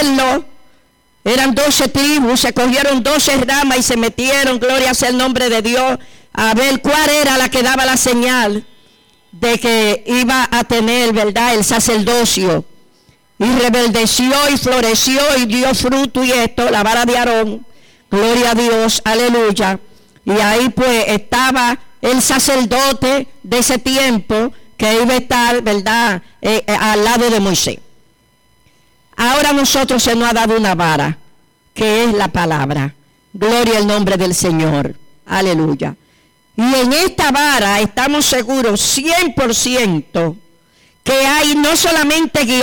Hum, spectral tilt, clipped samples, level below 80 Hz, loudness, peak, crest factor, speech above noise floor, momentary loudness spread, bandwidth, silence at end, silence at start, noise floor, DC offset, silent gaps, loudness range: none; -3 dB/octave; under 0.1%; -38 dBFS; -13 LUFS; -4 dBFS; 10 dB; 41 dB; 7 LU; 19.5 kHz; 0 s; 0 s; -54 dBFS; under 0.1%; none; 3 LU